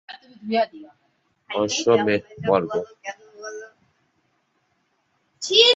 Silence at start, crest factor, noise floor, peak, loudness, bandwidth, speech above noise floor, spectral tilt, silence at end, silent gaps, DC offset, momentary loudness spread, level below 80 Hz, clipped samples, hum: 0.1 s; 22 dB; -69 dBFS; -2 dBFS; -22 LUFS; 8 kHz; 48 dB; -3 dB/octave; 0 s; none; under 0.1%; 19 LU; -64 dBFS; under 0.1%; none